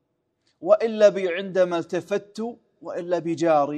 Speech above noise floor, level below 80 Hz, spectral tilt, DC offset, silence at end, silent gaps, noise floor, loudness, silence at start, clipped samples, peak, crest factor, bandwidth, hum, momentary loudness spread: 49 dB; -78 dBFS; -6 dB/octave; under 0.1%; 0 s; none; -71 dBFS; -23 LUFS; 0.6 s; under 0.1%; -4 dBFS; 18 dB; 9.2 kHz; none; 15 LU